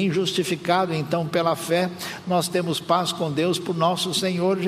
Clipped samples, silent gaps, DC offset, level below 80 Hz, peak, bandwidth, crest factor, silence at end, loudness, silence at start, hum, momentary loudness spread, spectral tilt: under 0.1%; none; under 0.1%; -66 dBFS; -6 dBFS; 15.5 kHz; 18 dB; 0 s; -23 LUFS; 0 s; none; 3 LU; -4.5 dB/octave